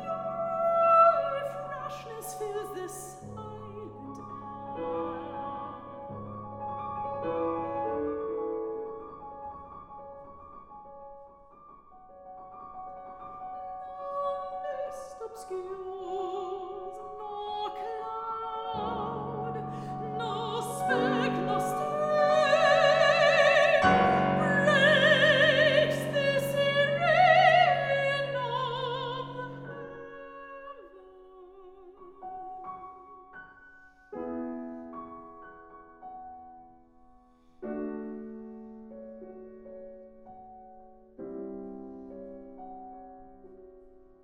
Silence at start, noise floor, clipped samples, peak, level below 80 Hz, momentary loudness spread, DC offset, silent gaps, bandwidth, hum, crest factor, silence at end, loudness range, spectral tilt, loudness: 0 s; -59 dBFS; under 0.1%; -8 dBFS; -62 dBFS; 25 LU; under 0.1%; none; 16 kHz; none; 22 dB; 0.35 s; 23 LU; -4.5 dB/octave; -27 LUFS